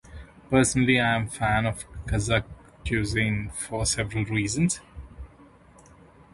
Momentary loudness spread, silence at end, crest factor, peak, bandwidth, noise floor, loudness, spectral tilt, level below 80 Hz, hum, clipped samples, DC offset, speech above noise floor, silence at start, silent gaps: 23 LU; 1.05 s; 22 dB; -6 dBFS; 11.5 kHz; -53 dBFS; -25 LUFS; -4.5 dB/octave; -42 dBFS; none; under 0.1%; under 0.1%; 28 dB; 0.05 s; none